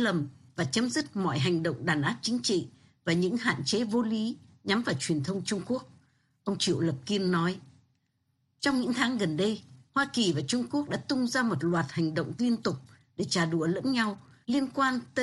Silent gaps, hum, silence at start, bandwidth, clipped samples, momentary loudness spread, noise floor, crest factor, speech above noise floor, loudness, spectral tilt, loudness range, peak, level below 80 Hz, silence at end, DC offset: none; none; 0 s; 12 kHz; under 0.1%; 8 LU; -75 dBFS; 16 dB; 46 dB; -29 LUFS; -5 dB/octave; 2 LU; -14 dBFS; -66 dBFS; 0 s; under 0.1%